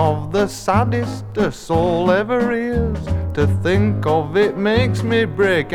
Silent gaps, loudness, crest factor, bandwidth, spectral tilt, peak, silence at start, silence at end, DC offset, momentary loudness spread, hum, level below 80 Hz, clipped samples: none; -18 LUFS; 16 dB; 14.5 kHz; -7 dB/octave; -2 dBFS; 0 s; 0 s; under 0.1%; 5 LU; none; -34 dBFS; under 0.1%